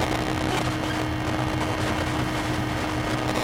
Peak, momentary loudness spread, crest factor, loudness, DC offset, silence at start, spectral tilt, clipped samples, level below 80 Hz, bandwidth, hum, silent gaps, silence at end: -8 dBFS; 1 LU; 16 dB; -26 LUFS; under 0.1%; 0 s; -5 dB/octave; under 0.1%; -38 dBFS; 17 kHz; none; none; 0 s